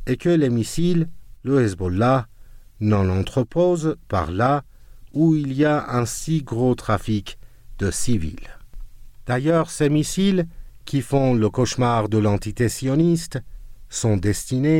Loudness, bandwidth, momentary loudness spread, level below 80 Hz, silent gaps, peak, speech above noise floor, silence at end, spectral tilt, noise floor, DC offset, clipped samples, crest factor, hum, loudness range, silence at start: -21 LUFS; 16.5 kHz; 8 LU; -40 dBFS; none; -8 dBFS; 22 dB; 0 s; -6.5 dB/octave; -42 dBFS; under 0.1%; under 0.1%; 14 dB; none; 3 LU; 0 s